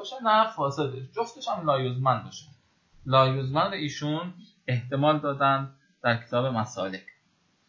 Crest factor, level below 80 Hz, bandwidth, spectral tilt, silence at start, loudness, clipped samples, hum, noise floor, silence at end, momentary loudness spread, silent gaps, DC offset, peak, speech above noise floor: 20 dB; -64 dBFS; 7.4 kHz; -6 dB/octave; 0 s; -26 LUFS; under 0.1%; none; -68 dBFS; 0.65 s; 14 LU; none; under 0.1%; -8 dBFS; 42 dB